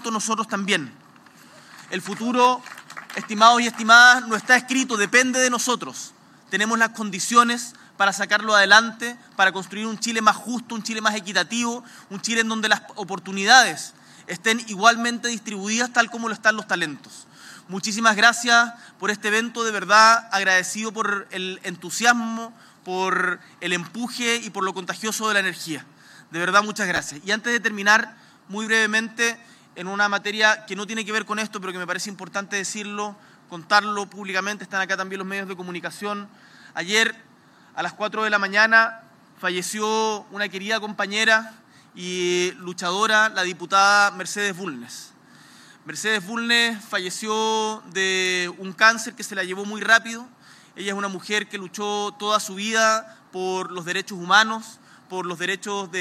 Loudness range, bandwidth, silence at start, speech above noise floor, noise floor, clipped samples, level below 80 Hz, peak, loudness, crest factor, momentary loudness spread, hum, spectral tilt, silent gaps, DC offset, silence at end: 8 LU; 15.5 kHz; 0 s; 31 dB; -53 dBFS; under 0.1%; -80 dBFS; 0 dBFS; -21 LUFS; 22 dB; 16 LU; none; -2 dB/octave; none; under 0.1%; 0 s